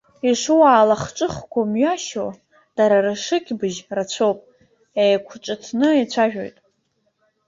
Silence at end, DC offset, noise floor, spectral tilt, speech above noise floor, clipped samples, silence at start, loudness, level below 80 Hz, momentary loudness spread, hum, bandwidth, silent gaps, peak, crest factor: 1 s; under 0.1%; -68 dBFS; -4.5 dB/octave; 50 dB; under 0.1%; 0.25 s; -19 LUFS; -58 dBFS; 15 LU; none; 7.8 kHz; none; -2 dBFS; 18 dB